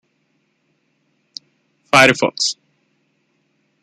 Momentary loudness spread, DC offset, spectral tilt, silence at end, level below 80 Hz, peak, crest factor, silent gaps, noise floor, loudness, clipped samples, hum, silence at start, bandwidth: 26 LU; under 0.1%; -3 dB/octave; 1.3 s; -62 dBFS; 0 dBFS; 22 dB; none; -66 dBFS; -14 LUFS; under 0.1%; none; 1.95 s; 13 kHz